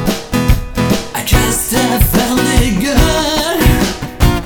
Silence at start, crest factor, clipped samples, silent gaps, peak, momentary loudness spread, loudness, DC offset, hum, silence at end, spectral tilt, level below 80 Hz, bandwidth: 0 s; 12 dB; under 0.1%; none; 0 dBFS; 4 LU; -13 LUFS; under 0.1%; none; 0 s; -4.5 dB/octave; -18 dBFS; 19.5 kHz